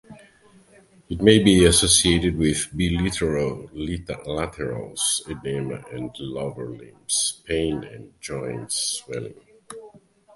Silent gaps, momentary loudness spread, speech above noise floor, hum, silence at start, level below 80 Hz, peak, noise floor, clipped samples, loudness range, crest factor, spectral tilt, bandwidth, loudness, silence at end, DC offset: none; 21 LU; 31 dB; none; 0.1 s; -40 dBFS; 0 dBFS; -54 dBFS; under 0.1%; 9 LU; 24 dB; -3.5 dB/octave; 12 kHz; -22 LUFS; 0.4 s; under 0.1%